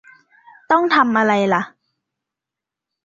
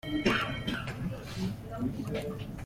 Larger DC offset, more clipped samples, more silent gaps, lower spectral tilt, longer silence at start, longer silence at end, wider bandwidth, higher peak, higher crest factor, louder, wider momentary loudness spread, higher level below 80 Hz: neither; neither; neither; about the same, -5.5 dB/octave vs -5.5 dB/octave; first, 0.7 s vs 0.05 s; first, 1.35 s vs 0 s; second, 7.6 kHz vs 16.5 kHz; first, -2 dBFS vs -14 dBFS; about the same, 18 dB vs 20 dB; first, -16 LUFS vs -34 LUFS; about the same, 7 LU vs 9 LU; second, -66 dBFS vs -48 dBFS